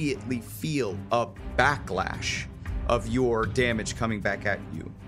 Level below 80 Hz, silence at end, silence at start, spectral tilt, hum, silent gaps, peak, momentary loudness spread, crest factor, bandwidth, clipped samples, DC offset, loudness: -40 dBFS; 0 s; 0 s; -5 dB/octave; none; none; -4 dBFS; 8 LU; 24 dB; 16 kHz; under 0.1%; under 0.1%; -28 LUFS